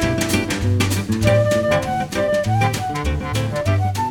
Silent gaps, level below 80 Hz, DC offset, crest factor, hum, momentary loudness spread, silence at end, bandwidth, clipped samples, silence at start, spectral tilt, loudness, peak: none; -34 dBFS; under 0.1%; 14 dB; none; 6 LU; 0 s; 19 kHz; under 0.1%; 0 s; -5.5 dB/octave; -19 LUFS; -4 dBFS